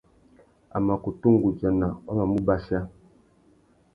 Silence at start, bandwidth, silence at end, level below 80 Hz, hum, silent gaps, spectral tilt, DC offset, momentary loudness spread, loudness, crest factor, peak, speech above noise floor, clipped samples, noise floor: 0.75 s; 5.2 kHz; 1.05 s; -46 dBFS; none; none; -11 dB/octave; under 0.1%; 10 LU; -25 LUFS; 20 dB; -6 dBFS; 36 dB; under 0.1%; -60 dBFS